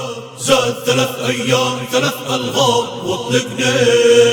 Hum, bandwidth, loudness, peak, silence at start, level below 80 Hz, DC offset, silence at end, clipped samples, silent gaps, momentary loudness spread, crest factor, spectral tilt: none; 19.5 kHz; -15 LUFS; 0 dBFS; 0 s; -54 dBFS; under 0.1%; 0 s; under 0.1%; none; 8 LU; 14 dB; -3.5 dB/octave